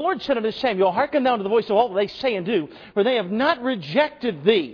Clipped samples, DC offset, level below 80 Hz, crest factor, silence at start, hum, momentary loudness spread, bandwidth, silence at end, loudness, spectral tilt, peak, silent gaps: under 0.1%; under 0.1%; -60 dBFS; 18 dB; 0 s; none; 4 LU; 5.4 kHz; 0 s; -22 LUFS; -7 dB/octave; -4 dBFS; none